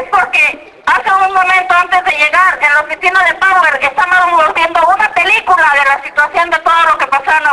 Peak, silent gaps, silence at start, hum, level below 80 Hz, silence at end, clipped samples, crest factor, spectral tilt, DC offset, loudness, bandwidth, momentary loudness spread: 0 dBFS; none; 0 s; none; -46 dBFS; 0 s; 0.1%; 10 dB; -1.5 dB/octave; under 0.1%; -9 LUFS; 11 kHz; 4 LU